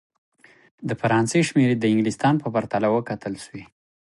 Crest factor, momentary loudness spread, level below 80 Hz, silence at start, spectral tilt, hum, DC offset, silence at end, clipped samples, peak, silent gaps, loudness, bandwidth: 16 dB; 15 LU; -60 dBFS; 0.8 s; -6 dB/octave; none; under 0.1%; 0.45 s; under 0.1%; -6 dBFS; none; -22 LUFS; 11.5 kHz